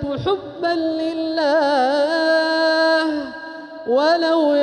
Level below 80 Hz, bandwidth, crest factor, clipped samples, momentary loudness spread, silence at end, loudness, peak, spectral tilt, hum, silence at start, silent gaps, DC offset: -52 dBFS; 9.6 kHz; 12 dB; under 0.1%; 10 LU; 0 s; -18 LUFS; -6 dBFS; -5 dB/octave; none; 0 s; none; under 0.1%